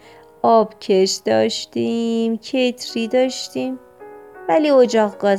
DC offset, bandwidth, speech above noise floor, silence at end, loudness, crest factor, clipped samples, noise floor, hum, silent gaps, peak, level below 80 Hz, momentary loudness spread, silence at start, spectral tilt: under 0.1%; 14.5 kHz; 23 dB; 0 s; -18 LUFS; 16 dB; under 0.1%; -40 dBFS; none; none; -2 dBFS; -66 dBFS; 11 LU; 0.45 s; -4.5 dB/octave